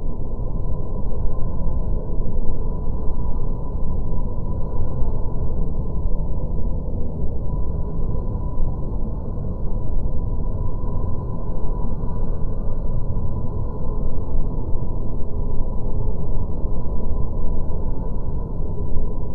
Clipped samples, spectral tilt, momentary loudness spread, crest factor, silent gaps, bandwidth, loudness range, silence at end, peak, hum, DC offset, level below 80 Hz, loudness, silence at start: under 0.1%; -13 dB/octave; 2 LU; 12 dB; none; 1.3 kHz; 1 LU; 0 s; -4 dBFS; none; under 0.1%; -22 dBFS; -28 LUFS; 0 s